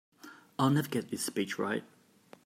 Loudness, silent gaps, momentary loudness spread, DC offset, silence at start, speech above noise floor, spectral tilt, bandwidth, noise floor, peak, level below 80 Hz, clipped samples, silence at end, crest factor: -32 LUFS; none; 18 LU; under 0.1%; 0.25 s; 28 dB; -5 dB/octave; 16 kHz; -59 dBFS; -16 dBFS; -76 dBFS; under 0.1%; 0.6 s; 18 dB